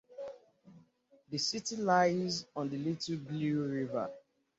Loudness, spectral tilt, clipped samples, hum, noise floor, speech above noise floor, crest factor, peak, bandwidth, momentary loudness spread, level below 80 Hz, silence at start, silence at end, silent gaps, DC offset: -34 LUFS; -4 dB/octave; under 0.1%; none; -67 dBFS; 33 dB; 20 dB; -16 dBFS; 8 kHz; 14 LU; -74 dBFS; 0.1 s; 0.4 s; none; under 0.1%